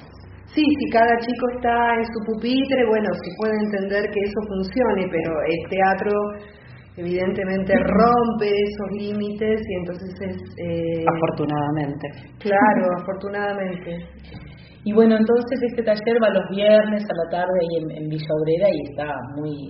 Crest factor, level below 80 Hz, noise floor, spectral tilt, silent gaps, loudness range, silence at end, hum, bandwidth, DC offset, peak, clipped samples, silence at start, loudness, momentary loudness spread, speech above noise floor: 18 dB; -48 dBFS; -42 dBFS; -5 dB/octave; none; 4 LU; 0 s; none; 5.8 kHz; under 0.1%; -2 dBFS; under 0.1%; 0 s; -21 LUFS; 13 LU; 21 dB